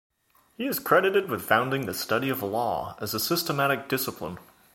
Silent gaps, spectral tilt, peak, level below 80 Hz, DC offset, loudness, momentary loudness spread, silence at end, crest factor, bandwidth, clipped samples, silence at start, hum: none; -4 dB/octave; -4 dBFS; -62 dBFS; under 0.1%; -26 LUFS; 10 LU; 0.3 s; 22 dB; 17 kHz; under 0.1%; 0.6 s; none